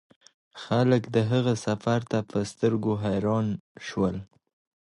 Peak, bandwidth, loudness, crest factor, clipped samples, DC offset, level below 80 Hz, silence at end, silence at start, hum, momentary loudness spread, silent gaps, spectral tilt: -8 dBFS; 11.5 kHz; -27 LUFS; 18 dB; under 0.1%; under 0.1%; -56 dBFS; 0.7 s; 0.55 s; none; 10 LU; 3.60-3.75 s; -7 dB/octave